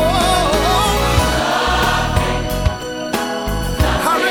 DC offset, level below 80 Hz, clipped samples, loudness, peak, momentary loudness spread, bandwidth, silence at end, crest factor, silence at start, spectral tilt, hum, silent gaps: under 0.1%; -24 dBFS; under 0.1%; -16 LUFS; -2 dBFS; 7 LU; 18 kHz; 0 s; 14 dB; 0 s; -4 dB/octave; none; none